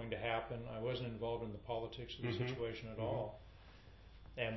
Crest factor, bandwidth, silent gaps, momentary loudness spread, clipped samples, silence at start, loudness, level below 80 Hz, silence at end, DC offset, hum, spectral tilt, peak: 20 dB; 6 kHz; none; 20 LU; under 0.1%; 0 s; -43 LUFS; -60 dBFS; 0 s; under 0.1%; none; -4.5 dB/octave; -24 dBFS